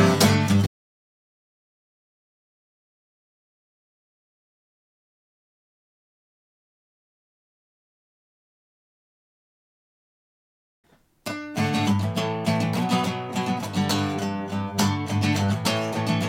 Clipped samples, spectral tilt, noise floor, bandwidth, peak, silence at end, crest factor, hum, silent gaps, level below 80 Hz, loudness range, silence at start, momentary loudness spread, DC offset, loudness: under 0.1%; -5 dB/octave; under -90 dBFS; 16.5 kHz; -4 dBFS; 0 s; 24 dB; none; 0.67-10.84 s; -62 dBFS; 9 LU; 0 s; 8 LU; under 0.1%; -24 LUFS